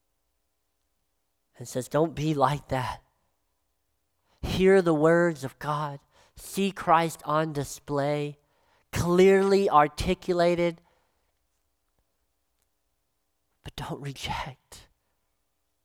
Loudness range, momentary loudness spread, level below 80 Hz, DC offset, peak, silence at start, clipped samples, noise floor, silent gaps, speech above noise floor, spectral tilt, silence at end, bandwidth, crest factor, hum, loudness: 16 LU; 16 LU; -50 dBFS; under 0.1%; -6 dBFS; 1.6 s; under 0.1%; -78 dBFS; none; 53 dB; -6 dB/octave; 1.05 s; 16.5 kHz; 22 dB; none; -25 LUFS